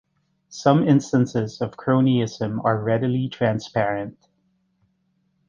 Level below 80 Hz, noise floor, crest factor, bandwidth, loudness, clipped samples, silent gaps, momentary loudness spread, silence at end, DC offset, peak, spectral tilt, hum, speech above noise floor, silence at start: -60 dBFS; -68 dBFS; 20 dB; 7.4 kHz; -22 LUFS; under 0.1%; none; 9 LU; 1.35 s; under 0.1%; -2 dBFS; -7 dB/octave; none; 48 dB; 0.5 s